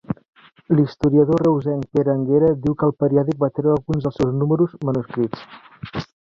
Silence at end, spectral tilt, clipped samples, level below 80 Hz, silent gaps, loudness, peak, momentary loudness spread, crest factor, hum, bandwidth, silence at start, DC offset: 0.15 s; -9.5 dB/octave; under 0.1%; -48 dBFS; 0.28-0.33 s; -19 LUFS; -4 dBFS; 14 LU; 16 dB; none; 7.2 kHz; 0.1 s; under 0.1%